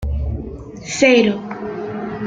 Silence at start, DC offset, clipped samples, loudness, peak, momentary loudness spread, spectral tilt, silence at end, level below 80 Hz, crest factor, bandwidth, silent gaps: 0 s; under 0.1%; under 0.1%; -18 LUFS; -2 dBFS; 17 LU; -5 dB/octave; 0 s; -30 dBFS; 18 dB; 9.4 kHz; none